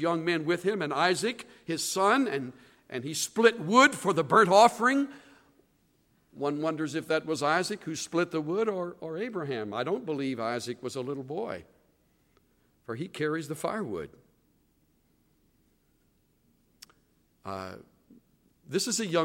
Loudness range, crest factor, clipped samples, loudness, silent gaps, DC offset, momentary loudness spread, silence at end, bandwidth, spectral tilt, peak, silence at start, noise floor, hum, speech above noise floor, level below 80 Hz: 17 LU; 24 dB; under 0.1%; -28 LUFS; none; under 0.1%; 17 LU; 0 s; 16.5 kHz; -4 dB/octave; -6 dBFS; 0 s; -69 dBFS; none; 41 dB; -72 dBFS